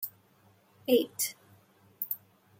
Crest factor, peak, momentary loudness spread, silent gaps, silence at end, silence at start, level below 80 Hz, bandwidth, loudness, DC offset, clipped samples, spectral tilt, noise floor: 24 dB; -12 dBFS; 13 LU; none; 0.45 s; 0 s; -82 dBFS; 16.5 kHz; -32 LUFS; under 0.1%; under 0.1%; -2.5 dB/octave; -64 dBFS